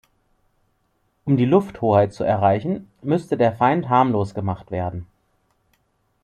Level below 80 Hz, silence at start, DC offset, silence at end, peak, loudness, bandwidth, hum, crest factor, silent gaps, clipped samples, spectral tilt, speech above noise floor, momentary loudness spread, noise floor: -56 dBFS; 1.25 s; under 0.1%; 1.2 s; -2 dBFS; -20 LUFS; 10 kHz; none; 20 dB; none; under 0.1%; -8.5 dB/octave; 48 dB; 11 LU; -68 dBFS